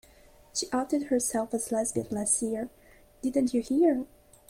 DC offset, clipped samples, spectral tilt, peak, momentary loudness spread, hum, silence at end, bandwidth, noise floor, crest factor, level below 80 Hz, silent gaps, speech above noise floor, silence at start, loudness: under 0.1%; under 0.1%; -3.5 dB/octave; -14 dBFS; 10 LU; none; 0.45 s; 16.5 kHz; -56 dBFS; 16 dB; -60 dBFS; none; 28 dB; 0.55 s; -28 LUFS